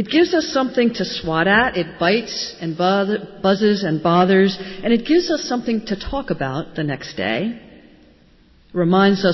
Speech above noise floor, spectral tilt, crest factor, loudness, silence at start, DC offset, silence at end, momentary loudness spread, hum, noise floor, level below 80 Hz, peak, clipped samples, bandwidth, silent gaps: 33 dB; -6 dB/octave; 16 dB; -19 LUFS; 0 s; under 0.1%; 0 s; 10 LU; none; -51 dBFS; -46 dBFS; -4 dBFS; under 0.1%; 6.2 kHz; none